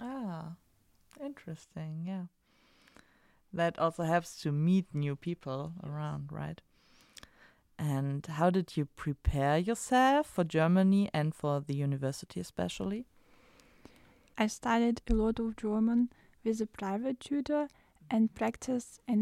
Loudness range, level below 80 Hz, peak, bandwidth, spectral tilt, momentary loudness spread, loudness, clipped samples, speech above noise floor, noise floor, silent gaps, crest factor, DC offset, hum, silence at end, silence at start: 9 LU; -50 dBFS; -14 dBFS; 14 kHz; -6.5 dB/octave; 15 LU; -33 LUFS; under 0.1%; 37 dB; -68 dBFS; none; 18 dB; under 0.1%; none; 0 s; 0 s